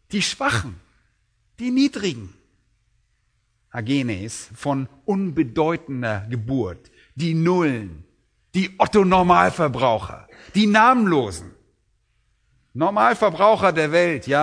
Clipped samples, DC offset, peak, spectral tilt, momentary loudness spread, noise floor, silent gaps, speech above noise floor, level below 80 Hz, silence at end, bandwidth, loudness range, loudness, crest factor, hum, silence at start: under 0.1%; under 0.1%; 0 dBFS; -5.5 dB/octave; 15 LU; -67 dBFS; none; 47 dB; -50 dBFS; 0 s; 11 kHz; 9 LU; -20 LUFS; 20 dB; none; 0.1 s